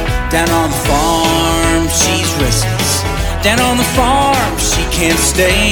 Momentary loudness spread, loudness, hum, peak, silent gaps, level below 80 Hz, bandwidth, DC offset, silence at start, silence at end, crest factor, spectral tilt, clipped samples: 3 LU; -12 LUFS; none; 0 dBFS; none; -22 dBFS; 19 kHz; under 0.1%; 0 s; 0 s; 12 dB; -3.5 dB/octave; under 0.1%